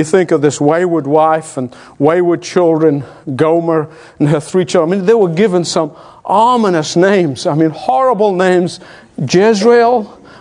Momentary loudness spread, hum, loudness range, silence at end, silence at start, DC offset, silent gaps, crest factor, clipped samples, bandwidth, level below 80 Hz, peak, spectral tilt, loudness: 12 LU; none; 1 LU; 0.25 s; 0 s; under 0.1%; none; 12 dB; 0.1%; 11 kHz; -58 dBFS; 0 dBFS; -6 dB/octave; -12 LUFS